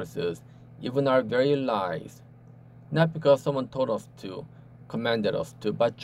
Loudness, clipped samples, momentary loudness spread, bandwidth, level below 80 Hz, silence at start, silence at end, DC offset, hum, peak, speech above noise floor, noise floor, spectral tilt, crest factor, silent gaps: -27 LUFS; under 0.1%; 16 LU; 14 kHz; -64 dBFS; 0 s; 0 s; under 0.1%; none; -8 dBFS; 24 dB; -50 dBFS; -7 dB/octave; 20 dB; none